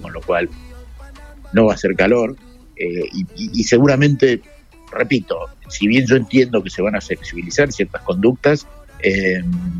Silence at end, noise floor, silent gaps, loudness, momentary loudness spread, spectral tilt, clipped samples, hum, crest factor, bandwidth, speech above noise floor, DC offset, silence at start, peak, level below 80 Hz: 0 s; -37 dBFS; none; -17 LUFS; 12 LU; -6 dB/octave; under 0.1%; none; 16 dB; 11 kHz; 21 dB; under 0.1%; 0 s; 0 dBFS; -40 dBFS